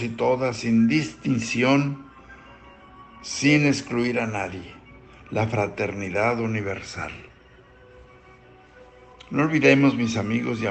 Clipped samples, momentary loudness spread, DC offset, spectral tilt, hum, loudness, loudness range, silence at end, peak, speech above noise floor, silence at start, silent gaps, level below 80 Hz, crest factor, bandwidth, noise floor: under 0.1%; 14 LU; under 0.1%; -5.5 dB/octave; none; -23 LUFS; 6 LU; 0 s; -4 dBFS; 29 dB; 0 s; none; -56 dBFS; 20 dB; 8.8 kHz; -51 dBFS